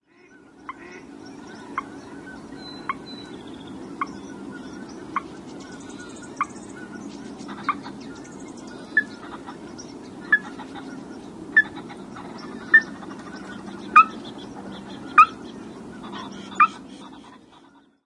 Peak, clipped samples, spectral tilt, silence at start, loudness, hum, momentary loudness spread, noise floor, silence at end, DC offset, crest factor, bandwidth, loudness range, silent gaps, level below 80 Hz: -2 dBFS; under 0.1%; -4 dB/octave; 0.25 s; -21 LUFS; none; 23 LU; -53 dBFS; 0.25 s; under 0.1%; 26 dB; 11.5 kHz; 15 LU; none; -62 dBFS